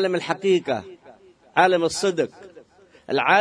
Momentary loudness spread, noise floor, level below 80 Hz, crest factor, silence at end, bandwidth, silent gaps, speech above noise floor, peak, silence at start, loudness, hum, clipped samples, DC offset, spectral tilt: 10 LU; -52 dBFS; -66 dBFS; 20 dB; 0 s; 10.5 kHz; none; 32 dB; -2 dBFS; 0 s; -22 LUFS; none; under 0.1%; under 0.1%; -4 dB/octave